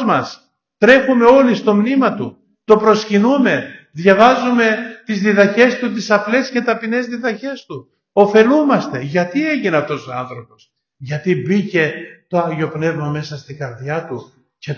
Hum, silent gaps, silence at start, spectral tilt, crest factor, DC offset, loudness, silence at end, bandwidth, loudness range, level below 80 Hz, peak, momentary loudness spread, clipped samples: none; none; 0 s; -6.5 dB/octave; 16 dB; under 0.1%; -15 LUFS; 0 s; 7.2 kHz; 7 LU; -58 dBFS; 0 dBFS; 18 LU; under 0.1%